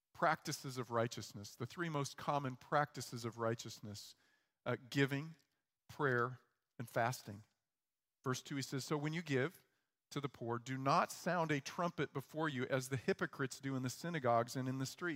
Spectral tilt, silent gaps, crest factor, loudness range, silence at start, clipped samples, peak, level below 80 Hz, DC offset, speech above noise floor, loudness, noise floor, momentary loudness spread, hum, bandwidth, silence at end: -5 dB/octave; none; 22 dB; 4 LU; 0.15 s; under 0.1%; -20 dBFS; -82 dBFS; under 0.1%; over 50 dB; -40 LUFS; under -90 dBFS; 12 LU; none; 16 kHz; 0 s